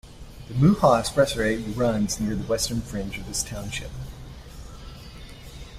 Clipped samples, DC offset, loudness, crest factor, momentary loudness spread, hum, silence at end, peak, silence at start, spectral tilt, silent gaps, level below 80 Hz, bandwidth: under 0.1%; under 0.1%; -24 LUFS; 20 dB; 23 LU; none; 0 s; -6 dBFS; 0.05 s; -5 dB/octave; none; -40 dBFS; 16 kHz